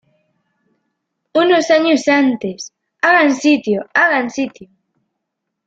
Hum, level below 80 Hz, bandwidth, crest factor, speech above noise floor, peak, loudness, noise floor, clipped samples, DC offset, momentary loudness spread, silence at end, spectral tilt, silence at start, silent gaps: none; -64 dBFS; 8 kHz; 16 dB; 62 dB; -2 dBFS; -14 LUFS; -76 dBFS; under 0.1%; under 0.1%; 13 LU; 1.05 s; -4 dB/octave; 1.35 s; none